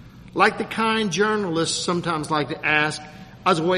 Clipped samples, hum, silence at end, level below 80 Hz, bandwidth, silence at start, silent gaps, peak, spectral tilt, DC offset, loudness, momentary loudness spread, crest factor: under 0.1%; none; 0 s; -54 dBFS; 13 kHz; 0 s; none; -2 dBFS; -4 dB/octave; under 0.1%; -22 LUFS; 6 LU; 20 dB